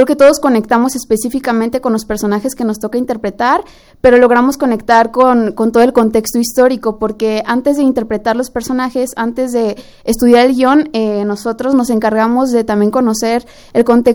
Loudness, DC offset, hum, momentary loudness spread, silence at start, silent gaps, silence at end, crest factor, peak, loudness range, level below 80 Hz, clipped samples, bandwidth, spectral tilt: -12 LUFS; under 0.1%; none; 9 LU; 0 s; none; 0 s; 12 dB; 0 dBFS; 4 LU; -42 dBFS; 0.2%; over 20 kHz; -5 dB/octave